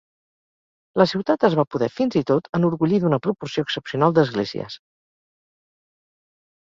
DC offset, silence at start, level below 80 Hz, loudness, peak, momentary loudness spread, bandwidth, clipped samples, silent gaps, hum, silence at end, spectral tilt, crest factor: under 0.1%; 0.95 s; -60 dBFS; -21 LUFS; -2 dBFS; 9 LU; 7.6 kHz; under 0.1%; 1.67-1.71 s, 2.49-2.53 s; none; 1.9 s; -7.5 dB/octave; 20 dB